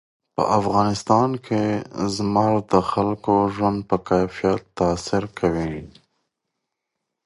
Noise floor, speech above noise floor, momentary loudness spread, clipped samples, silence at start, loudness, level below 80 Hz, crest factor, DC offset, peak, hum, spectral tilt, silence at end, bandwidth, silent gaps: -81 dBFS; 60 dB; 6 LU; under 0.1%; 0.4 s; -21 LUFS; -46 dBFS; 20 dB; under 0.1%; -2 dBFS; none; -6.5 dB/octave; 1.4 s; 11.5 kHz; none